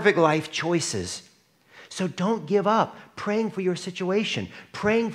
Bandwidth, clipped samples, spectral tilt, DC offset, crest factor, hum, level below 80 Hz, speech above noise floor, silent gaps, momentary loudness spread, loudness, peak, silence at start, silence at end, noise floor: 13.5 kHz; under 0.1%; -4.5 dB/octave; under 0.1%; 20 dB; none; -66 dBFS; 32 dB; none; 11 LU; -25 LUFS; -4 dBFS; 0 s; 0 s; -57 dBFS